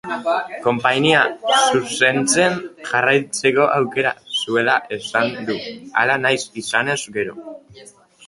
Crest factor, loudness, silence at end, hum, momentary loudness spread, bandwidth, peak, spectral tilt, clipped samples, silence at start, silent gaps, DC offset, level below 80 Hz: 18 dB; -18 LUFS; 0.45 s; none; 10 LU; 11.5 kHz; 0 dBFS; -3 dB/octave; under 0.1%; 0.05 s; none; under 0.1%; -60 dBFS